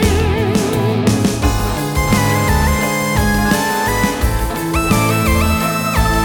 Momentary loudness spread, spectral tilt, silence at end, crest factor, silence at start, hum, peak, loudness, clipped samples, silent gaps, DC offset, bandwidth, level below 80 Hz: 4 LU; -5 dB/octave; 0 s; 14 dB; 0 s; none; 0 dBFS; -15 LUFS; under 0.1%; none; under 0.1%; over 20 kHz; -22 dBFS